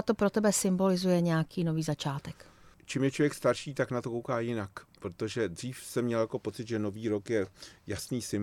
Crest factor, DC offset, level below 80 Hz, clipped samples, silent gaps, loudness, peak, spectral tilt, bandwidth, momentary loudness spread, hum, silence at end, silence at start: 18 dB; under 0.1%; -64 dBFS; under 0.1%; none; -31 LUFS; -14 dBFS; -5.5 dB/octave; 16.5 kHz; 13 LU; none; 0 s; 0 s